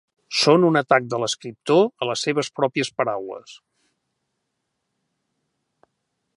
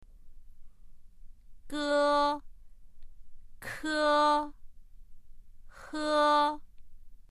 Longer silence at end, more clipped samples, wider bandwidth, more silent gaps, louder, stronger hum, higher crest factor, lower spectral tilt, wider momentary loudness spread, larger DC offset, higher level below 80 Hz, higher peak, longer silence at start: first, 2.8 s vs 0.1 s; neither; second, 11.5 kHz vs 13.5 kHz; neither; first, -21 LUFS vs -28 LUFS; neither; first, 22 dB vs 16 dB; first, -4.5 dB/octave vs -3 dB/octave; second, 11 LU vs 17 LU; neither; second, -74 dBFS vs -52 dBFS; first, -2 dBFS vs -16 dBFS; first, 0.3 s vs 0.1 s